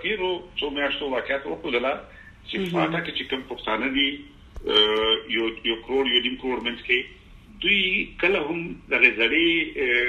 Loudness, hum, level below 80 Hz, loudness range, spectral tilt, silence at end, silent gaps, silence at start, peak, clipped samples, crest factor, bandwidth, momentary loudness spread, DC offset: -23 LUFS; none; -50 dBFS; 5 LU; -5 dB/octave; 0 s; none; 0 s; -2 dBFS; under 0.1%; 22 dB; 12.5 kHz; 11 LU; under 0.1%